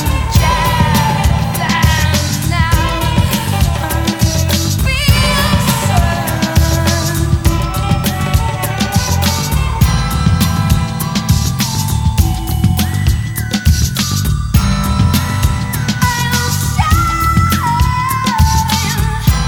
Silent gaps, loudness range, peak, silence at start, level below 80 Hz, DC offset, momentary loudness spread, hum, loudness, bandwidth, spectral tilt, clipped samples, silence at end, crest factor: none; 1 LU; 0 dBFS; 0 s; -20 dBFS; under 0.1%; 4 LU; none; -14 LUFS; 20 kHz; -4.5 dB/octave; under 0.1%; 0 s; 12 dB